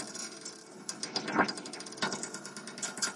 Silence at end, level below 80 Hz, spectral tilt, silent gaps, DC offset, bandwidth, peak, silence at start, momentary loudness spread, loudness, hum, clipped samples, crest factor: 0 s; -78 dBFS; -2 dB/octave; none; under 0.1%; 11.5 kHz; -14 dBFS; 0 s; 12 LU; -36 LUFS; none; under 0.1%; 24 dB